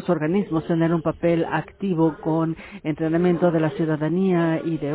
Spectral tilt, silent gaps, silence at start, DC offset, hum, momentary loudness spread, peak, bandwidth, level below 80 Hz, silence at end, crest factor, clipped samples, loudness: -12 dB/octave; none; 0 s; under 0.1%; none; 6 LU; -6 dBFS; 4 kHz; -52 dBFS; 0 s; 16 dB; under 0.1%; -22 LUFS